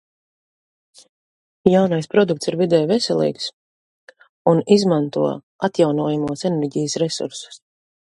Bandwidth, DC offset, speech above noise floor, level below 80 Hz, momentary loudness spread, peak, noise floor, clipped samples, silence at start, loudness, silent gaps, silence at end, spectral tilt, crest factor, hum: 11.5 kHz; under 0.1%; over 72 dB; -60 dBFS; 10 LU; 0 dBFS; under -90 dBFS; under 0.1%; 1.65 s; -19 LUFS; 3.53-4.07 s, 4.29-4.45 s, 5.43-5.59 s; 0.45 s; -6 dB/octave; 20 dB; none